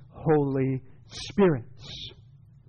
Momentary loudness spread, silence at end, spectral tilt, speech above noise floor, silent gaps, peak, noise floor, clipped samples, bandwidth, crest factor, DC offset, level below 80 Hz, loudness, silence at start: 18 LU; 0.6 s; -7 dB/octave; 26 dB; none; -14 dBFS; -52 dBFS; under 0.1%; 8.2 kHz; 14 dB; under 0.1%; -54 dBFS; -26 LUFS; 0 s